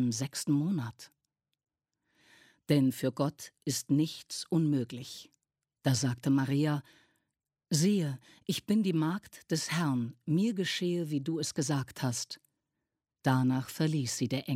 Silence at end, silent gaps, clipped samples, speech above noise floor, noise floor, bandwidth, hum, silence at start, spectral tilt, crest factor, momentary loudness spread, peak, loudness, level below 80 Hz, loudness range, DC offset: 0 s; none; under 0.1%; 56 dB; -87 dBFS; 16 kHz; none; 0 s; -5.5 dB/octave; 20 dB; 9 LU; -12 dBFS; -32 LUFS; -72 dBFS; 2 LU; under 0.1%